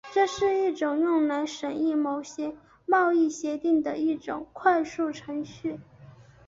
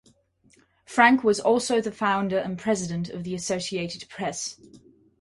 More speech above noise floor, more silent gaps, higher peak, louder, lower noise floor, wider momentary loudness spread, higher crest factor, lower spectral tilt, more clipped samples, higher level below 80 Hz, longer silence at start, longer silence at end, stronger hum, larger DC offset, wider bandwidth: second, 25 dB vs 37 dB; neither; second, -8 dBFS vs -2 dBFS; about the same, -27 LUFS vs -25 LUFS; second, -51 dBFS vs -62 dBFS; about the same, 12 LU vs 13 LU; about the same, 18 dB vs 22 dB; about the same, -4.5 dB/octave vs -4 dB/octave; neither; about the same, -64 dBFS vs -62 dBFS; second, 0.05 s vs 0.9 s; second, 0.25 s vs 0.4 s; neither; neither; second, 7.8 kHz vs 11.5 kHz